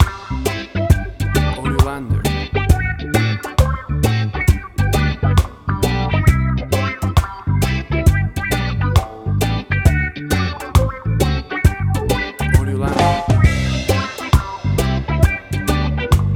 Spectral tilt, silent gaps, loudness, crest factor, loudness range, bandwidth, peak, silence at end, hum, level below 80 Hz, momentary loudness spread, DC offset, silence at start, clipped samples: -6 dB/octave; none; -18 LUFS; 14 dB; 1 LU; 18 kHz; -2 dBFS; 0 s; none; -22 dBFS; 4 LU; under 0.1%; 0 s; under 0.1%